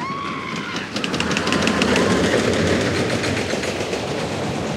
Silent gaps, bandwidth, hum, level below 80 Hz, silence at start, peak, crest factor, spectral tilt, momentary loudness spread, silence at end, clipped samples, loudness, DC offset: none; 16 kHz; none; -44 dBFS; 0 s; -2 dBFS; 20 dB; -4.5 dB/octave; 8 LU; 0 s; under 0.1%; -20 LUFS; under 0.1%